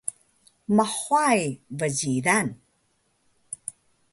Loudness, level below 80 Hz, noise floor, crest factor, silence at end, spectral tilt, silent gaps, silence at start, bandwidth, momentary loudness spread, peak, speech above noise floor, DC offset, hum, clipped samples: -24 LUFS; -66 dBFS; -69 dBFS; 20 dB; 0.4 s; -4 dB/octave; none; 0.05 s; 12 kHz; 16 LU; -6 dBFS; 46 dB; under 0.1%; none; under 0.1%